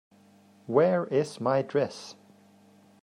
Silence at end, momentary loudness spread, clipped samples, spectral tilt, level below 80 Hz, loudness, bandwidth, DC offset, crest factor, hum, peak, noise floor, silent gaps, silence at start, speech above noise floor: 0.9 s; 14 LU; under 0.1%; -6.5 dB/octave; -78 dBFS; -27 LUFS; 11 kHz; under 0.1%; 18 dB; none; -10 dBFS; -58 dBFS; none; 0.7 s; 32 dB